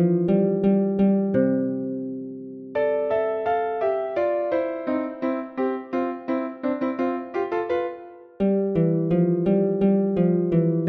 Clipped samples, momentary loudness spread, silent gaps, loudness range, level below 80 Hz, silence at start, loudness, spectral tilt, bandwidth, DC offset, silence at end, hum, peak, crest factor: under 0.1%; 7 LU; none; 4 LU; -56 dBFS; 0 s; -23 LUFS; -11 dB/octave; 4.7 kHz; under 0.1%; 0 s; none; -8 dBFS; 14 dB